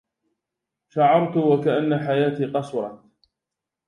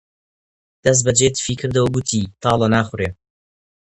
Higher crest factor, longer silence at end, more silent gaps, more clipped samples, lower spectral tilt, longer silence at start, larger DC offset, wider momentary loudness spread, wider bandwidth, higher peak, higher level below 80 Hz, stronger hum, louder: about the same, 18 dB vs 20 dB; about the same, 0.9 s vs 0.85 s; neither; neither; first, -8.5 dB/octave vs -4 dB/octave; about the same, 0.95 s vs 0.85 s; neither; first, 12 LU vs 8 LU; about the same, 10.5 kHz vs 11 kHz; second, -4 dBFS vs 0 dBFS; second, -70 dBFS vs -44 dBFS; neither; second, -21 LUFS vs -18 LUFS